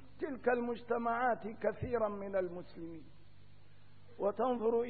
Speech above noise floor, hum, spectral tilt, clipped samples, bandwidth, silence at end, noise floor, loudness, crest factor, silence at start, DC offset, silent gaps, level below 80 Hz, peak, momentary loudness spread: 27 dB; 50 Hz at -65 dBFS; -5.5 dB/octave; under 0.1%; 4.6 kHz; 0 s; -62 dBFS; -36 LUFS; 18 dB; 0 s; 0.3%; none; -64 dBFS; -20 dBFS; 14 LU